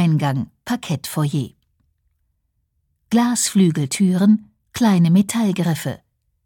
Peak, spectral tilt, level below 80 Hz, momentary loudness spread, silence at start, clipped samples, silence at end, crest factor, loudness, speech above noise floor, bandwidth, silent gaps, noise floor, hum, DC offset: -6 dBFS; -5.5 dB/octave; -58 dBFS; 11 LU; 0 s; under 0.1%; 0.5 s; 14 dB; -19 LUFS; 52 dB; 18.5 kHz; none; -69 dBFS; none; under 0.1%